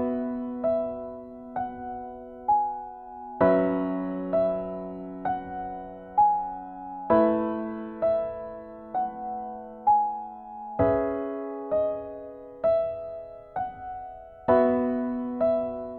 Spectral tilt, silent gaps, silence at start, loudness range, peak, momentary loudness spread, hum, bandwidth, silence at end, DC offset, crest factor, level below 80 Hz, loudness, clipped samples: -11 dB/octave; none; 0 s; 2 LU; -8 dBFS; 17 LU; none; 4.3 kHz; 0 s; under 0.1%; 20 dB; -56 dBFS; -27 LUFS; under 0.1%